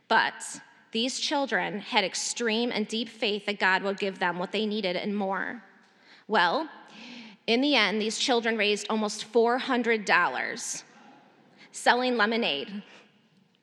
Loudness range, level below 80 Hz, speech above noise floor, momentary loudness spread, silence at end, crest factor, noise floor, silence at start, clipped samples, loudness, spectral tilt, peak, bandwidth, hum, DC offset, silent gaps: 4 LU; under -90 dBFS; 36 dB; 14 LU; 0.65 s; 24 dB; -64 dBFS; 0.1 s; under 0.1%; -27 LUFS; -2.5 dB/octave; -4 dBFS; 12.5 kHz; none; under 0.1%; none